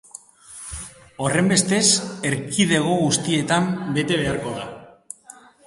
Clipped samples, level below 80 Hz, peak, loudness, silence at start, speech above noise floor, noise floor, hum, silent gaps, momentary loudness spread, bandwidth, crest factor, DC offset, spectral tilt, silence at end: under 0.1%; -50 dBFS; -2 dBFS; -20 LUFS; 0.5 s; 27 dB; -47 dBFS; none; none; 22 LU; 11.5 kHz; 20 dB; under 0.1%; -3.5 dB/octave; 0.35 s